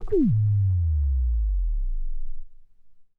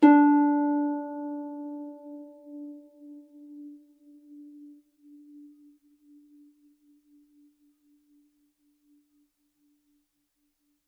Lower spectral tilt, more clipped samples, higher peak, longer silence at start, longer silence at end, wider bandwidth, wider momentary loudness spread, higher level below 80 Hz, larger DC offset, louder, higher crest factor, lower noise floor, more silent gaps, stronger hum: first, -13.5 dB/octave vs -6.5 dB/octave; neither; second, -12 dBFS vs -6 dBFS; about the same, 0 s vs 0 s; second, 0.15 s vs 6.45 s; second, 1.9 kHz vs 4 kHz; second, 17 LU vs 29 LU; first, -26 dBFS vs -84 dBFS; neither; about the same, -25 LUFS vs -25 LUFS; second, 12 dB vs 24 dB; second, -48 dBFS vs -76 dBFS; neither; neither